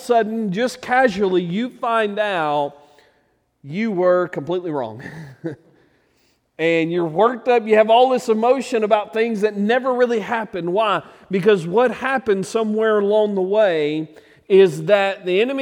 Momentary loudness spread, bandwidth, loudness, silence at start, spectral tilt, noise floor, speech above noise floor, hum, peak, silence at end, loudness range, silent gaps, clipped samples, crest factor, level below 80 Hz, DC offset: 10 LU; 14 kHz; -18 LUFS; 0 s; -6 dB/octave; -63 dBFS; 45 dB; none; -2 dBFS; 0 s; 6 LU; none; under 0.1%; 16 dB; -64 dBFS; under 0.1%